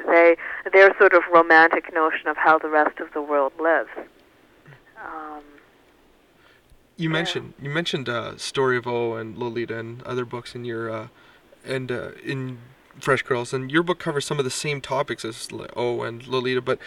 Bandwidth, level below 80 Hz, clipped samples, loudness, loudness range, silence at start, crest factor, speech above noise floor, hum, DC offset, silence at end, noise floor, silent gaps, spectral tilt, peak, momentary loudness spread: 13 kHz; -62 dBFS; under 0.1%; -22 LUFS; 14 LU; 0 s; 20 dB; 34 dB; none; under 0.1%; 0 s; -57 dBFS; none; -5 dB/octave; -4 dBFS; 18 LU